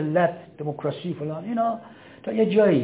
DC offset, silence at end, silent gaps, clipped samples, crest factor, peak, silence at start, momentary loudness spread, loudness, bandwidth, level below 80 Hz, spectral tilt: under 0.1%; 0 s; none; under 0.1%; 16 dB; -8 dBFS; 0 s; 14 LU; -25 LUFS; 4 kHz; -68 dBFS; -11.5 dB/octave